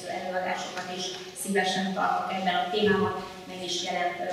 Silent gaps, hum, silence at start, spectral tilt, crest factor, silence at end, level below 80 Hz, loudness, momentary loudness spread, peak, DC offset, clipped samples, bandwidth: none; none; 0 s; -3.5 dB/octave; 18 dB; 0 s; -64 dBFS; -28 LUFS; 9 LU; -12 dBFS; under 0.1%; under 0.1%; 15.5 kHz